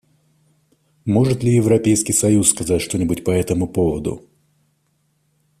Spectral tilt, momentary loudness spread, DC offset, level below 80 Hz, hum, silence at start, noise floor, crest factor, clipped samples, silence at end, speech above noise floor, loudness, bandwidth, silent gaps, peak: -5.5 dB/octave; 9 LU; under 0.1%; -46 dBFS; none; 1.05 s; -65 dBFS; 20 dB; under 0.1%; 1.4 s; 48 dB; -17 LUFS; 15.5 kHz; none; 0 dBFS